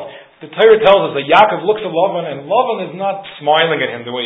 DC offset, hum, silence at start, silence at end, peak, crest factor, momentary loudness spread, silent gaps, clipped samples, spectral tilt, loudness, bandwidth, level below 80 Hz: under 0.1%; none; 0 s; 0 s; 0 dBFS; 14 dB; 12 LU; none; under 0.1%; -6.5 dB/octave; -14 LUFS; 5.6 kHz; -56 dBFS